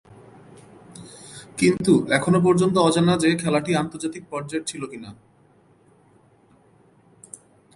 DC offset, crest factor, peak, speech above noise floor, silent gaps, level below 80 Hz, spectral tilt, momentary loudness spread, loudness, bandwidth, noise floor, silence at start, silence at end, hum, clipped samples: under 0.1%; 20 dB; -4 dBFS; 36 dB; none; -58 dBFS; -5.5 dB/octave; 25 LU; -21 LUFS; 11.5 kHz; -57 dBFS; 0.95 s; 2.6 s; none; under 0.1%